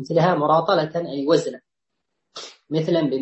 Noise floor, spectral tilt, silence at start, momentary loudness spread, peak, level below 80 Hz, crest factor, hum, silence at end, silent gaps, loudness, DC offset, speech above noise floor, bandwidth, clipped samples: -81 dBFS; -6.5 dB/octave; 0 s; 19 LU; -6 dBFS; -66 dBFS; 16 dB; none; 0 s; none; -21 LUFS; under 0.1%; 61 dB; 8.4 kHz; under 0.1%